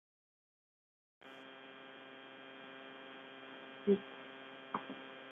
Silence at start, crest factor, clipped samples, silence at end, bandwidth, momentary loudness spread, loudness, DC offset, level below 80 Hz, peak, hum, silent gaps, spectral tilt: 1.2 s; 26 dB; under 0.1%; 0 s; 3.9 kHz; 18 LU; -44 LUFS; under 0.1%; under -90 dBFS; -20 dBFS; none; none; -4.5 dB/octave